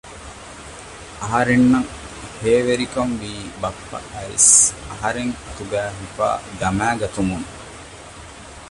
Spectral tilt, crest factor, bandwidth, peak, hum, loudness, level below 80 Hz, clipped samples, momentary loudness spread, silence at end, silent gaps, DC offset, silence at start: -3.5 dB/octave; 22 dB; 11.5 kHz; 0 dBFS; none; -18 LUFS; -42 dBFS; under 0.1%; 23 LU; 0 s; none; under 0.1%; 0.05 s